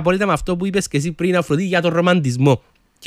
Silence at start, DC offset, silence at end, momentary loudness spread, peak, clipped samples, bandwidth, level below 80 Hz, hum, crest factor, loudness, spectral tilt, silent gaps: 0 s; under 0.1%; 0 s; 4 LU; -2 dBFS; under 0.1%; 15 kHz; -42 dBFS; none; 16 dB; -18 LUFS; -6 dB/octave; none